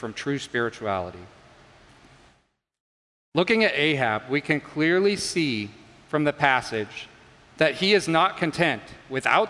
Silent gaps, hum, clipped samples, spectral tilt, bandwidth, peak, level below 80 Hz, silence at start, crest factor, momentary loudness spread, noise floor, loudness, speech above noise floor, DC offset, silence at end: 2.80-3.32 s; none; under 0.1%; -4.5 dB/octave; 11.5 kHz; -2 dBFS; -62 dBFS; 0 s; 22 dB; 11 LU; -67 dBFS; -24 LUFS; 43 dB; under 0.1%; 0 s